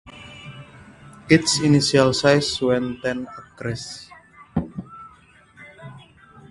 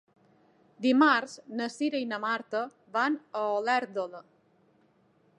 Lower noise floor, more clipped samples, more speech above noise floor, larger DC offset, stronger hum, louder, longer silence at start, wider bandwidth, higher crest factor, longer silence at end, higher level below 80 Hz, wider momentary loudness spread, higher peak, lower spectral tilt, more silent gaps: second, -52 dBFS vs -66 dBFS; neither; second, 32 dB vs 38 dB; neither; neither; first, -20 LUFS vs -29 LUFS; second, 0.05 s vs 0.8 s; about the same, 11.5 kHz vs 11 kHz; about the same, 22 dB vs 20 dB; second, 0.5 s vs 1.15 s; first, -50 dBFS vs -88 dBFS; first, 25 LU vs 13 LU; first, 0 dBFS vs -10 dBFS; about the same, -4.5 dB/octave vs -4 dB/octave; neither